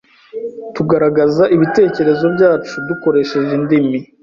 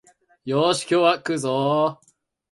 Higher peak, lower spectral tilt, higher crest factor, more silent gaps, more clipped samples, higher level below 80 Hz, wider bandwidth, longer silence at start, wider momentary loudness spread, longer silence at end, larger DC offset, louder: about the same, -2 dBFS vs -4 dBFS; first, -7.5 dB/octave vs -5 dB/octave; second, 12 dB vs 20 dB; neither; neither; first, -52 dBFS vs -68 dBFS; second, 7.4 kHz vs 11.5 kHz; about the same, 0.35 s vs 0.45 s; first, 14 LU vs 7 LU; second, 0.2 s vs 0.6 s; neither; first, -14 LUFS vs -21 LUFS